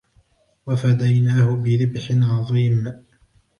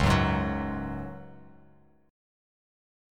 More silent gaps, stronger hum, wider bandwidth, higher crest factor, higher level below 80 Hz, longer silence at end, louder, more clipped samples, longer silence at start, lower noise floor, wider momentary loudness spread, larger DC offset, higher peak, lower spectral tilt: neither; neither; second, 6.8 kHz vs 16.5 kHz; second, 12 dB vs 20 dB; second, -54 dBFS vs -40 dBFS; second, 0.6 s vs 1 s; first, -19 LUFS vs -29 LUFS; neither; first, 0.65 s vs 0 s; about the same, -59 dBFS vs -60 dBFS; second, 7 LU vs 21 LU; neither; about the same, -8 dBFS vs -10 dBFS; first, -8.5 dB/octave vs -6.5 dB/octave